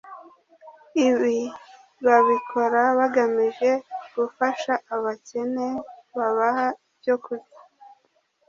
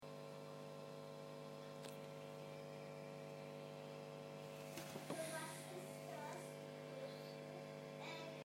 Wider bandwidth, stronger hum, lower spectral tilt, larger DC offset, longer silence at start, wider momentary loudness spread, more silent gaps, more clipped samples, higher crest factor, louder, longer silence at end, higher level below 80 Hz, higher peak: second, 7.4 kHz vs 16 kHz; second, none vs 50 Hz at -60 dBFS; about the same, -4.5 dB/octave vs -4.5 dB/octave; neither; about the same, 0.05 s vs 0 s; first, 14 LU vs 5 LU; neither; neither; about the same, 20 dB vs 18 dB; first, -23 LUFS vs -52 LUFS; first, 0.6 s vs 0 s; first, -72 dBFS vs under -90 dBFS; first, -4 dBFS vs -34 dBFS